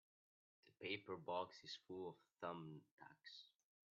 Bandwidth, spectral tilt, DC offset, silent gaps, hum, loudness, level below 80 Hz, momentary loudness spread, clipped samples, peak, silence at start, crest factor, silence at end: 7.2 kHz; -2.5 dB/octave; under 0.1%; 2.91-2.98 s; none; -52 LUFS; under -90 dBFS; 14 LU; under 0.1%; -30 dBFS; 0.65 s; 24 dB; 0.45 s